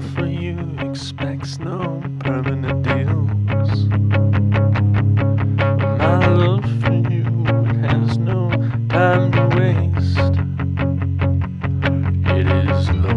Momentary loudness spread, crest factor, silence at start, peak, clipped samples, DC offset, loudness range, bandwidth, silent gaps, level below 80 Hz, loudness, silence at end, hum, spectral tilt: 9 LU; 16 dB; 0 s; 0 dBFS; under 0.1%; under 0.1%; 4 LU; 7 kHz; none; -36 dBFS; -18 LUFS; 0 s; none; -8.5 dB/octave